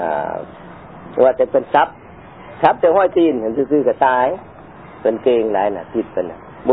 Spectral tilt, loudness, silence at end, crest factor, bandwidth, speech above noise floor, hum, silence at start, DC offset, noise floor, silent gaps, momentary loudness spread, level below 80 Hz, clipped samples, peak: -9.5 dB/octave; -17 LUFS; 0 s; 18 dB; 4.7 kHz; 23 dB; none; 0 s; 0.2%; -38 dBFS; none; 16 LU; -52 dBFS; under 0.1%; 0 dBFS